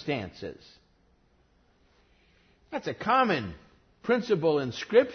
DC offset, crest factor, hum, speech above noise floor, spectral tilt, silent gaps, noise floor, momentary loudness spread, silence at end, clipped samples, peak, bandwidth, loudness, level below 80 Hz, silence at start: under 0.1%; 22 dB; none; 38 dB; -6 dB/octave; none; -65 dBFS; 16 LU; 0 s; under 0.1%; -8 dBFS; 6.6 kHz; -28 LUFS; -62 dBFS; 0 s